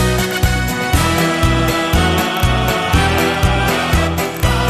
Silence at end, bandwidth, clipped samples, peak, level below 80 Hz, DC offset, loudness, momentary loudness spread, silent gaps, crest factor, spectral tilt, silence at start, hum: 0 s; 14 kHz; under 0.1%; 0 dBFS; -22 dBFS; under 0.1%; -15 LUFS; 2 LU; none; 14 dB; -4.5 dB/octave; 0 s; none